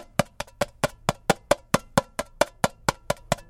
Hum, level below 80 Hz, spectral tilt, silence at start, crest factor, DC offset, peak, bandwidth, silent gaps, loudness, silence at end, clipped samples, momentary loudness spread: none; -46 dBFS; -4 dB/octave; 0.2 s; 26 dB; under 0.1%; -2 dBFS; 17 kHz; none; -27 LUFS; 0.1 s; under 0.1%; 7 LU